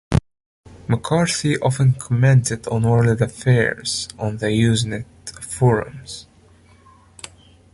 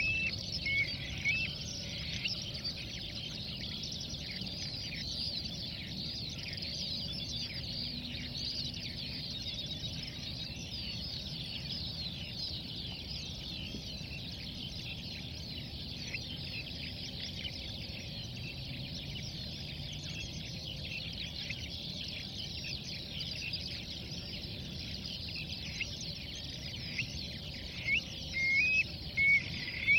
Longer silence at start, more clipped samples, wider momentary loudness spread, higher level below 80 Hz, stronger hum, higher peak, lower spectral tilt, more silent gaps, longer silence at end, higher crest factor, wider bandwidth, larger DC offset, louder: about the same, 0.1 s vs 0 s; neither; first, 18 LU vs 9 LU; first, -42 dBFS vs -52 dBFS; neither; first, -2 dBFS vs -18 dBFS; first, -5.5 dB/octave vs -3 dB/octave; first, 0.46-0.64 s vs none; first, 1.5 s vs 0 s; about the same, 18 dB vs 20 dB; second, 11.5 kHz vs 16.5 kHz; neither; first, -19 LUFS vs -37 LUFS